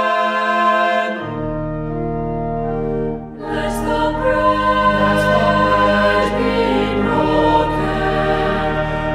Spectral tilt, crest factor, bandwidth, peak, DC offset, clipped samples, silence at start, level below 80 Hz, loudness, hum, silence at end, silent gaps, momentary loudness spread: -6 dB/octave; 14 dB; 15 kHz; -2 dBFS; under 0.1%; under 0.1%; 0 s; -32 dBFS; -17 LUFS; none; 0 s; none; 9 LU